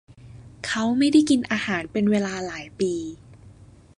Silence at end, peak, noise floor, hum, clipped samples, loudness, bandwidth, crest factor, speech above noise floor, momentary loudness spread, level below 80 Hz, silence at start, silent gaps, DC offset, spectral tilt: 0.45 s; -6 dBFS; -48 dBFS; none; under 0.1%; -23 LUFS; 11 kHz; 18 dB; 26 dB; 14 LU; -54 dBFS; 0.25 s; none; under 0.1%; -5 dB/octave